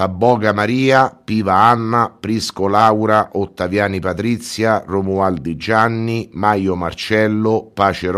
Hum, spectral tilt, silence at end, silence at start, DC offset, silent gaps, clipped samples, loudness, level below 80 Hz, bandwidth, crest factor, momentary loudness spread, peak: none; -6 dB/octave; 0 s; 0 s; under 0.1%; none; under 0.1%; -16 LUFS; -48 dBFS; 14.5 kHz; 16 dB; 8 LU; 0 dBFS